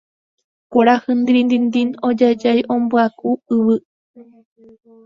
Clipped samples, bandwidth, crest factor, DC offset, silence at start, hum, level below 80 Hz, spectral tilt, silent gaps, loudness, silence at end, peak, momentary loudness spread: under 0.1%; 7 kHz; 18 dB; under 0.1%; 0.7 s; none; -62 dBFS; -6.5 dB/octave; 3.85-4.14 s; -16 LUFS; 0.85 s; 0 dBFS; 5 LU